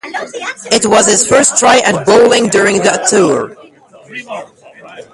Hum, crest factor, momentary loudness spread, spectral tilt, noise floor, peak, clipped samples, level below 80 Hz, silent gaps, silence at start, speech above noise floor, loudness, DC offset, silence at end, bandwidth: none; 12 dB; 18 LU; -2.5 dB/octave; -40 dBFS; 0 dBFS; under 0.1%; -50 dBFS; none; 0.05 s; 29 dB; -9 LUFS; under 0.1%; 0.1 s; 12 kHz